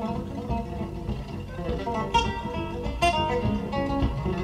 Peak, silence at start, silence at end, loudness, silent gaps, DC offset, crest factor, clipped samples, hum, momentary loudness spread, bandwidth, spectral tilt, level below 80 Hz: -10 dBFS; 0 s; 0 s; -28 LUFS; none; under 0.1%; 18 dB; under 0.1%; none; 9 LU; 13 kHz; -6 dB/octave; -36 dBFS